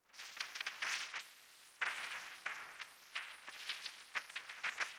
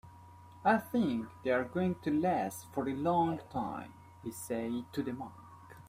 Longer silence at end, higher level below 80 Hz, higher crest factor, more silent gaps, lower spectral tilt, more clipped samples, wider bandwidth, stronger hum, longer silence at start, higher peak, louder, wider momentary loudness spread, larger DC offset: about the same, 0 s vs 0 s; second, -88 dBFS vs -68 dBFS; first, 24 dB vs 18 dB; neither; second, 2 dB/octave vs -6.5 dB/octave; neither; first, over 20 kHz vs 16 kHz; neither; about the same, 0.1 s vs 0.05 s; second, -24 dBFS vs -16 dBFS; second, -44 LUFS vs -34 LUFS; second, 11 LU vs 14 LU; neither